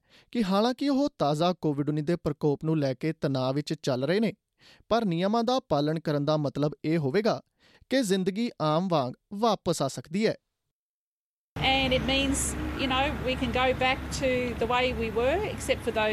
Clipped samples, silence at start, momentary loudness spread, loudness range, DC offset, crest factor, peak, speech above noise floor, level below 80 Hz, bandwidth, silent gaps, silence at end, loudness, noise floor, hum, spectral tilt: under 0.1%; 0.35 s; 5 LU; 2 LU; under 0.1%; 16 dB; -10 dBFS; over 63 dB; -46 dBFS; 14.5 kHz; 10.71-11.56 s; 0 s; -27 LUFS; under -90 dBFS; none; -5 dB/octave